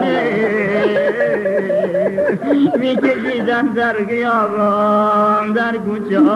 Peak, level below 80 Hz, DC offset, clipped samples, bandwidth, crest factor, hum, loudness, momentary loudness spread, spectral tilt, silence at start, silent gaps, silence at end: -4 dBFS; -56 dBFS; under 0.1%; under 0.1%; 11.5 kHz; 12 dB; none; -16 LUFS; 4 LU; -7.5 dB/octave; 0 s; none; 0 s